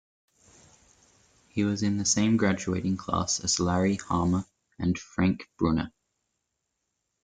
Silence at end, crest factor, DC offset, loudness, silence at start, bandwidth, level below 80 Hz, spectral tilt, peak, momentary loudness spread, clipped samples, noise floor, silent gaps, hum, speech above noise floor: 1.35 s; 18 dB; under 0.1%; -27 LUFS; 1.55 s; 9.6 kHz; -54 dBFS; -4.5 dB/octave; -10 dBFS; 7 LU; under 0.1%; -81 dBFS; none; none; 55 dB